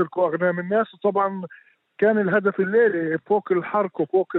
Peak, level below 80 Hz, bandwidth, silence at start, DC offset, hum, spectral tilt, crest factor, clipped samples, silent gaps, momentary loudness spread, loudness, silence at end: -6 dBFS; -76 dBFS; 4.1 kHz; 0 s; under 0.1%; none; -10 dB/octave; 16 dB; under 0.1%; none; 6 LU; -22 LUFS; 0 s